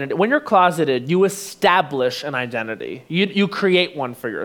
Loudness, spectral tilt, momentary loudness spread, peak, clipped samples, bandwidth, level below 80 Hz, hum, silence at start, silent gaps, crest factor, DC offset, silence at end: -19 LUFS; -5 dB/octave; 10 LU; -2 dBFS; under 0.1%; 19.5 kHz; -68 dBFS; none; 0 s; none; 18 dB; under 0.1%; 0 s